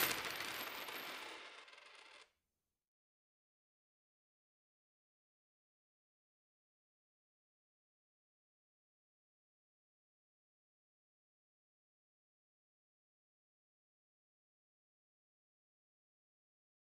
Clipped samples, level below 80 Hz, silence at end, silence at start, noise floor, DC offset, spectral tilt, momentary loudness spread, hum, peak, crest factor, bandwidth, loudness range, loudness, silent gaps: under 0.1%; -88 dBFS; 14.65 s; 0 s; under -90 dBFS; under 0.1%; -0.5 dB/octave; 18 LU; none; -18 dBFS; 36 dB; 15 kHz; 19 LU; -44 LUFS; none